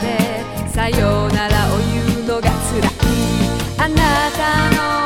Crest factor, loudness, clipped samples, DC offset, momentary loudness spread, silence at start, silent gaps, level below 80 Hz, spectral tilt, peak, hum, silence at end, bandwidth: 16 dB; -17 LUFS; under 0.1%; under 0.1%; 4 LU; 0 s; none; -26 dBFS; -5 dB/octave; 0 dBFS; none; 0 s; 18 kHz